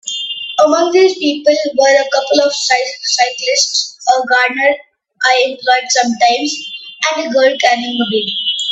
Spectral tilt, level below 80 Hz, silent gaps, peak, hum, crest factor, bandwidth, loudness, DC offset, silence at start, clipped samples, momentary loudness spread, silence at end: -1 dB/octave; -64 dBFS; none; 0 dBFS; none; 14 dB; 8.4 kHz; -13 LUFS; under 0.1%; 0.05 s; under 0.1%; 6 LU; 0 s